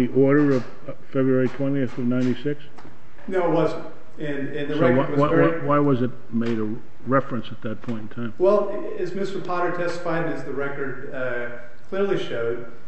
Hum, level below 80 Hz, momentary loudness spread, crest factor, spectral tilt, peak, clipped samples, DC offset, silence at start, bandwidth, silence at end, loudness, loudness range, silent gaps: none; -56 dBFS; 13 LU; 18 dB; -8 dB/octave; -6 dBFS; under 0.1%; 5%; 0 s; 8.4 kHz; 0.1 s; -24 LUFS; 5 LU; none